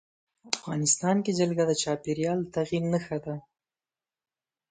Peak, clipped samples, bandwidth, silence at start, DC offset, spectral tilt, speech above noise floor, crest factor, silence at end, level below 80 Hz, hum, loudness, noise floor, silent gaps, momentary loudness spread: -4 dBFS; under 0.1%; 9.6 kHz; 0.45 s; under 0.1%; -4.5 dB/octave; over 62 dB; 24 dB; 1.3 s; -64 dBFS; none; -28 LUFS; under -90 dBFS; none; 10 LU